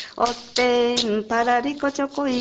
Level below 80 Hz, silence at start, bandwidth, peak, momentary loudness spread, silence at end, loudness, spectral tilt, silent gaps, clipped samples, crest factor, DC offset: -56 dBFS; 0 s; 8.8 kHz; -4 dBFS; 6 LU; 0 s; -22 LUFS; -3 dB/octave; none; under 0.1%; 18 dB; under 0.1%